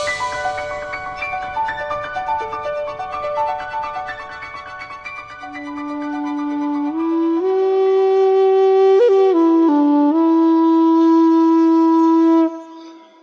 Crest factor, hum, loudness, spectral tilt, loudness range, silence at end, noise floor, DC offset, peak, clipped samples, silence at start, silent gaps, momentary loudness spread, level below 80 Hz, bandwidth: 10 dB; none; -16 LUFS; -5.5 dB/octave; 13 LU; 0.25 s; -39 dBFS; under 0.1%; -6 dBFS; under 0.1%; 0 s; none; 17 LU; -52 dBFS; 8.4 kHz